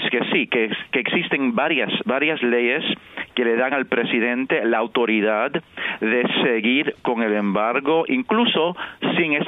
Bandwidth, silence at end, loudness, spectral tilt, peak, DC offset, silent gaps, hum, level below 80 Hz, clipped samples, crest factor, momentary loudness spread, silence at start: 4 kHz; 0 s; -20 LUFS; -8 dB/octave; -4 dBFS; under 0.1%; none; none; -66 dBFS; under 0.1%; 16 dB; 5 LU; 0 s